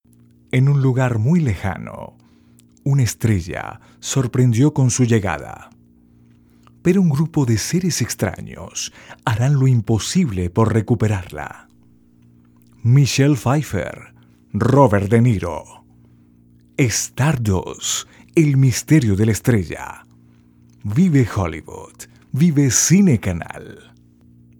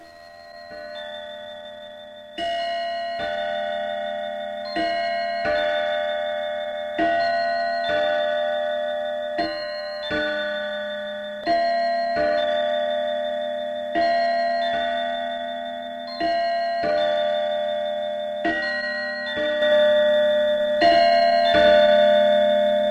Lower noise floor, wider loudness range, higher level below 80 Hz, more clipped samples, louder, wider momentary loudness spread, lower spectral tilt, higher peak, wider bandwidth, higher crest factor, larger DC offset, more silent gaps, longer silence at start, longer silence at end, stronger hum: first, -52 dBFS vs -44 dBFS; second, 3 LU vs 9 LU; first, -48 dBFS vs -56 dBFS; neither; first, -18 LUFS vs -22 LUFS; first, 17 LU vs 14 LU; first, -5.5 dB/octave vs -4 dB/octave; first, 0 dBFS vs -6 dBFS; first, 18.5 kHz vs 9 kHz; about the same, 18 dB vs 16 dB; neither; neither; first, 0.55 s vs 0 s; first, 0.9 s vs 0 s; neither